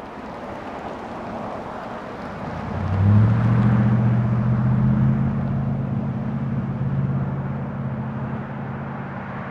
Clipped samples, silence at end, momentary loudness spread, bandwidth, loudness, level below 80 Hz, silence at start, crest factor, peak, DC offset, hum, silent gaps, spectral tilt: under 0.1%; 0 s; 14 LU; 5.6 kHz; -23 LUFS; -42 dBFS; 0 s; 16 dB; -4 dBFS; under 0.1%; none; none; -10 dB/octave